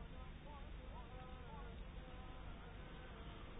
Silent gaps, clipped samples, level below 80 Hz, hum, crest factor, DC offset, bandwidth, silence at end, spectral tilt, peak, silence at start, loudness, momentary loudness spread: none; under 0.1%; -56 dBFS; none; 12 dB; under 0.1%; 3.8 kHz; 0 s; -4.5 dB/octave; -40 dBFS; 0 s; -55 LUFS; 1 LU